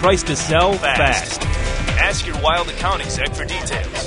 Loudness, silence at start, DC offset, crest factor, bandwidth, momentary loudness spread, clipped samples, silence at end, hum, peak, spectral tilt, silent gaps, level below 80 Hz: -18 LUFS; 0 s; under 0.1%; 16 dB; 11 kHz; 7 LU; under 0.1%; 0 s; none; -2 dBFS; -3.5 dB/octave; none; -26 dBFS